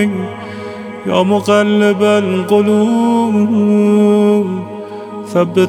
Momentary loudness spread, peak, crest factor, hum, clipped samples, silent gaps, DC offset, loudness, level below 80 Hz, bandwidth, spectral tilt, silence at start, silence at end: 16 LU; 0 dBFS; 12 dB; none; under 0.1%; none; under 0.1%; -12 LUFS; -64 dBFS; 12.5 kHz; -6.5 dB/octave; 0 s; 0 s